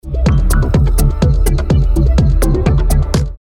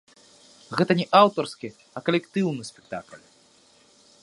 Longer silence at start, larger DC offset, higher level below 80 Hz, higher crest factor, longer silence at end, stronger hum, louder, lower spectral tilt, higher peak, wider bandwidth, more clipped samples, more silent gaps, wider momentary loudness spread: second, 0.05 s vs 0.7 s; neither; first, -12 dBFS vs -70 dBFS; second, 10 dB vs 24 dB; second, 0.05 s vs 1.05 s; neither; first, -14 LUFS vs -23 LUFS; about the same, -6.5 dB/octave vs -6 dB/octave; about the same, 0 dBFS vs -2 dBFS; first, 16.5 kHz vs 11.5 kHz; neither; neither; second, 2 LU vs 19 LU